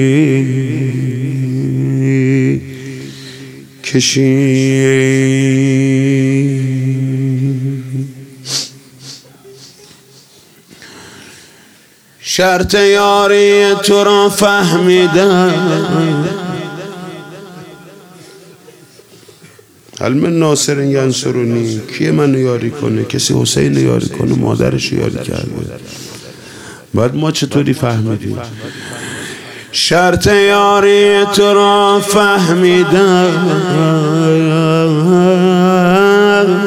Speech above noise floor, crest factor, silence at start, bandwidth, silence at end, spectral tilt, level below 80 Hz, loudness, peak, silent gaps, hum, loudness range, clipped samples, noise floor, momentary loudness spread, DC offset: 34 dB; 12 dB; 0 s; 16.5 kHz; 0 s; -5.5 dB/octave; -46 dBFS; -11 LUFS; 0 dBFS; none; none; 11 LU; under 0.1%; -45 dBFS; 18 LU; under 0.1%